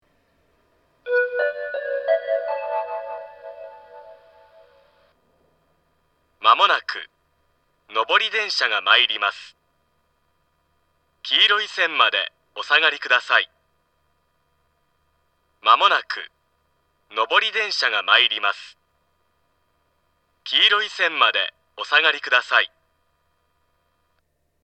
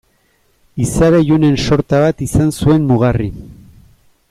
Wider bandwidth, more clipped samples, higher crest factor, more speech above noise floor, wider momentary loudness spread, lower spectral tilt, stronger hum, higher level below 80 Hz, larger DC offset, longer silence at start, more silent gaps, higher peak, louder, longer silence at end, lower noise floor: second, 8.8 kHz vs 15 kHz; neither; first, 24 dB vs 12 dB; first, 50 dB vs 45 dB; first, 18 LU vs 10 LU; second, 0.5 dB/octave vs -7 dB/octave; neither; second, -76 dBFS vs -32 dBFS; neither; first, 1.05 s vs 0.75 s; neither; about the same, 0 dBFS vs -2 dBFS; second, -19 LUFS vs -13 LUFS; first, 1.95 s vs 0.75 s; first, -70 dBFS vs -57 dBFS